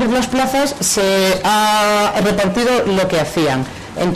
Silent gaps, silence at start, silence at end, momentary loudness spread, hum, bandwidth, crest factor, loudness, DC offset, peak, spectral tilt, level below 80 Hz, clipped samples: none; 0 s; 0 s; 4 LU; none; 14 kHz; 10 dB; -15 LUFS; under 0.1%; -6 dBFS; -3.5 dB/octave; -40 dBFS; under 0.1%